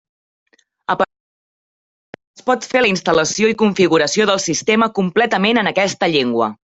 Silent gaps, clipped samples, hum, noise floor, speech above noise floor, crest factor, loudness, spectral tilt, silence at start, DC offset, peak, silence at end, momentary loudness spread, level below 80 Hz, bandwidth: 1.20-2.13 s, 2.27-2.34 s; under 0.1%; none; under -90 dBFS; over 74 dB; 16 dB; -16 LUFS; -3.5 dB/octave; 0.9 s; under 0.1%; -2 dBFS; 0.15 s; 6 LU; -56 dBFS; 8.4 kHz